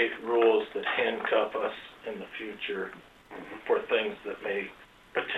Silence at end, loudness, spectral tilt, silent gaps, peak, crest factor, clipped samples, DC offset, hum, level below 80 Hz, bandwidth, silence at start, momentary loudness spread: 0 s; -30 LUFS; -5 dB/octave; none; -12 dBFS; 18 dB; under 0.1%; under 0.1%; none; -68 dBFS; 7.8 kHz; 0 s; 16 LU